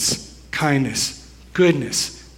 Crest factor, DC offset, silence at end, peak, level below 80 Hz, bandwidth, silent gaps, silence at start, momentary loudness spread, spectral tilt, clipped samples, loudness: 18 dB; under 0.1%; 0.1 s; -4 dBFS; -46 dBFS; 16.5 kHz; none; 0 s; 11 LU; -3.5 dB/octave; under 0.1%; -20 LUFS